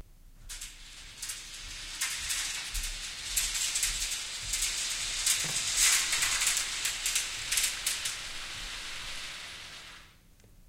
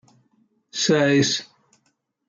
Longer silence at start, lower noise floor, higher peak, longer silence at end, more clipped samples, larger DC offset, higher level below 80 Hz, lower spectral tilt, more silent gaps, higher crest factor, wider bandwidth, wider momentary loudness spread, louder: second, 0 s vs 0.75 s; second, -58 dBFS vs -70 dBFS; second, -12 dBFS vs -6 dBFS; second, 0 s vs 0.85 s; neither; neither; first, -48 dBFS vs -66 dBFS; second, 1.5 dB/octave vs -4 dB/octave; neither; about the same, 22 dB vs 18 dB; first, 17 kHz vs 7.6 kHz; first, 16 LU vs 10 LU; second, -30 LUFS vs -20 LUFS